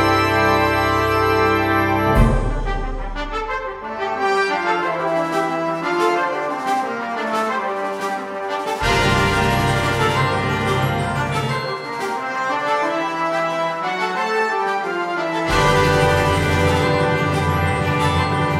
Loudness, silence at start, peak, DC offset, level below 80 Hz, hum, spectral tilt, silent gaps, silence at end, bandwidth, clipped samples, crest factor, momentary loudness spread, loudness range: -19 LUFS; 0 s; -2 dBFS; under 0.1%; -32 dBFS; none; -5.5 dB/octave; none; 0 s; 16 kHz; under 0.1%; 16 dB; 8 LU; 4 LU